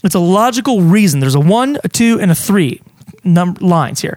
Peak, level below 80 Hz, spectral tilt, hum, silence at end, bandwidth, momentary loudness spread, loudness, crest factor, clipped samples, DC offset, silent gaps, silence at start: 0 dBFS; -50 dBFS; -6 dB/octave; none; 0 s; 17 kHz; 4 LU; -12 LUFS; 12 dB; under 0.1%; under 0.1%; none; 0.05 s